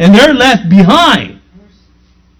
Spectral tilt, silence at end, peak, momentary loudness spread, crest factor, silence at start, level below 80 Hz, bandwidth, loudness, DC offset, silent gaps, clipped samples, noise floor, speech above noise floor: -5.5 dB/octave; 1.05 s; 0 dBFS; 8 LU; 8 dB; 0 s; -36 dBFS; 15.5 kHz; -6 LUFS; under 0.1%; none; 4%; -47 dBFS; 41 dB